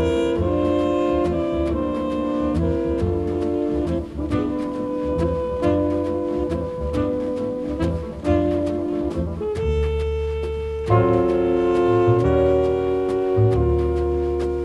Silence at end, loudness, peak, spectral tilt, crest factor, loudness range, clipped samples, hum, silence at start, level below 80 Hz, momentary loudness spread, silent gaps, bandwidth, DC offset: 0 s; -21 LUFS; -4 dBFS; -8.5 dB/octave; 16 dB; 4 LU; under 0.1%; none; 0 s; -32 dBFS; 8 LU; none; 11 kHz; under 0.1%